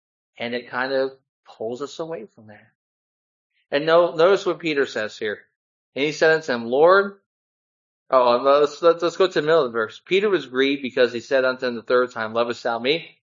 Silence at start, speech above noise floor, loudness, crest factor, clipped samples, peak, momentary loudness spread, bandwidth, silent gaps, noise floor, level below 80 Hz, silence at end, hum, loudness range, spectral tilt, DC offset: 0.4 s; over 69 dB; -21 LUFS; 18 dB; under 0.1%; -2 dBFS; 13 LU; 7.6 kHz; 1.29-1.43 s, 2.75-3.50 s, 5.56-5.92 s, 7.26-8.06 s; under -90 dBFS; -76 dBFS; 0.35 s; none; 7 LU; -4.5 dB/octave; under 0.1%